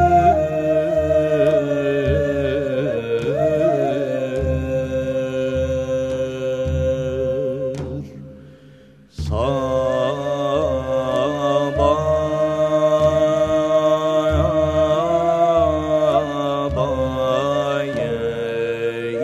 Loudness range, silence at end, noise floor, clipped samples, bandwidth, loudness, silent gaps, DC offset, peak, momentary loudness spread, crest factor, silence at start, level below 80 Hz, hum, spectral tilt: 6 LU; 0 s; -46 dBFS; under 0.1%; 13 kHz; -19 LUFS; none; under 0.1%; -4 dBFS; 7 LU; 14 dB; 0 s; -36 dBFS; none; -7 dB/octave